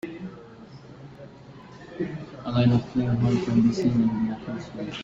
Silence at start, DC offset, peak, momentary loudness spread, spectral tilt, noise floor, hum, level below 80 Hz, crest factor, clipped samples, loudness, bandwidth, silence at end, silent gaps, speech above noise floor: 0.05 s; under 0.1%; -8 dBFS; 24 LU; -8 dB/octave; -45 dBFS; none; -52 dBFS; 18 dB; under 0.1%; -25 LUFS; 7.6 kHz; 0 s; none; 23 dB